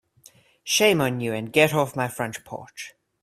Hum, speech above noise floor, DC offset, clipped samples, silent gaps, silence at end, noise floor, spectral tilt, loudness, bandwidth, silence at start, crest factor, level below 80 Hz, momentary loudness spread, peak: none; 32 dB; under 0.1%; under 0.1%; none; 0.3 s; -55 dBFS; -3.5 dB/octave; -22 LUFS; 16 kHz; 0.65 s; 22 dB; -62 dBFS; 20 LU; -4 dBFS